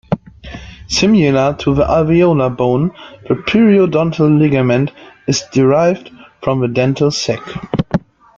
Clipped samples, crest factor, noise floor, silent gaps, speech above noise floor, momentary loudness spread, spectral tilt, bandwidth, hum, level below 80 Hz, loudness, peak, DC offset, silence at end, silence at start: under 0.1%; 12 dB; -32 dBFS; none; 20 dB; 12 LU; -6 dB/octave; 7.8 kHz; none; -38 dBFS; -14 LUFS; -2 dBFS; under 0.1%; 0.4 s; 0.1 s